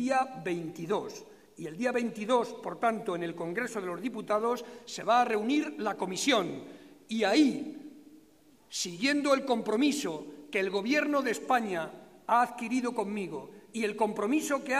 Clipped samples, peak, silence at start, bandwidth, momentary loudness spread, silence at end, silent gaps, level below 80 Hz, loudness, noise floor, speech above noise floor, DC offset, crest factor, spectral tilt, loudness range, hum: under 0.1%; -12 dBFS; 0 s; 15.5 kHz; 14 LU; 0 s; none; -76 dBFS; -30 LUFS; -61 dBFS; 31 dB; under 0.1%; 18 dB; -4 dB/octave; 3 LU; none